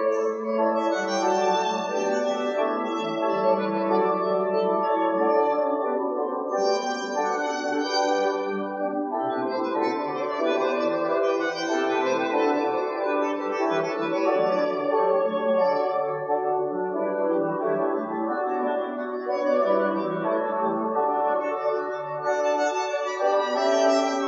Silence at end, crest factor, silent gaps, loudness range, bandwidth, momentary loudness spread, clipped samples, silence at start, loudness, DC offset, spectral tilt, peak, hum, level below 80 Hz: 0 s; 14 dB; none; 2 LU; 7.6 kHz; 5 LU; under 0.1%; 0 s; -25 LUFS; under 0.1%; -4.5 dB/octave; -10 dBFS; none; -84 dBFS